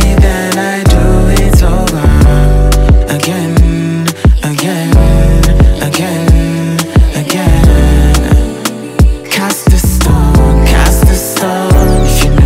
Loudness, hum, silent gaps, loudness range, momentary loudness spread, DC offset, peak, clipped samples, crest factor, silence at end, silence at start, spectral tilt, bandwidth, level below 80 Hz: -9 LUFS; none; none; 1 LU; 5 LU; under 0.1%; 0 dBFS; 1%; 8 dB; 0 s; 0 s; -5.5 dB/octave; 16.5 kHz; -10 dBFS